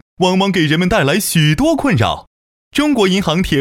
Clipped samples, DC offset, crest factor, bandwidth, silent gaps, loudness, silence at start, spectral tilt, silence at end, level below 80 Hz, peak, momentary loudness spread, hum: under 0.1%; under 0.1%; 14 dB; 16.5 kHz; 2.27-2.71 s; -14 LUFS; 0.2 s; -5 dB/octave; 0 s; -36 dBFS; -2 dBFS; 5 LU; none